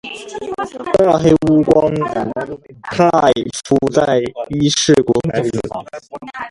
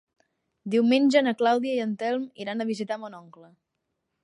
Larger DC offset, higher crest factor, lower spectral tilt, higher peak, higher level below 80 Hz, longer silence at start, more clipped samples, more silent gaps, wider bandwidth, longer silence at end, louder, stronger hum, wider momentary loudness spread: neither; about the same, 16 dB vs 18 dB; about the same, -5 dB/octave vs -5.5 dB/octave; first, 0 dBFS vs -8 dBFS; first, -44 dBFS vs -80 dBFS; second, 0.05 s vs 0.65 s; neither; neither; about the same, 11.5 kHz vs 11 kHz; second, 0 s vs 1.05 s; first, -15 LUFS vs -25 LUFS; neither; first, 16 LU vs 13 LU